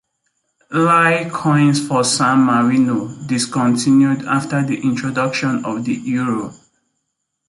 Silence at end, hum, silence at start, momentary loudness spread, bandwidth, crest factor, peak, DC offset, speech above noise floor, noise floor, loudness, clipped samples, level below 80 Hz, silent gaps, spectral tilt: 0.95 s; none; 0.7 s; 9 LU; 11.5 kHz; 14 dB; -2 dBFS; under 0.1%; 58 dB; -74 dBFS; -16 LUFS; under 0.1%; -58 dBFS; none; -5 dB/octave